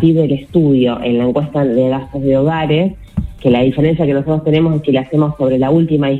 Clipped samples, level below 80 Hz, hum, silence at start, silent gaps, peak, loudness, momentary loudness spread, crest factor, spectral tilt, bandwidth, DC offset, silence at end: under 0.1%; -36 dBFS; none; 0 s; none; 0 dBFS; -14 LUFS; 4 LU; 12 dB; -9.5 dB/octave; 4.3 kHz; under 0.1%; 0 s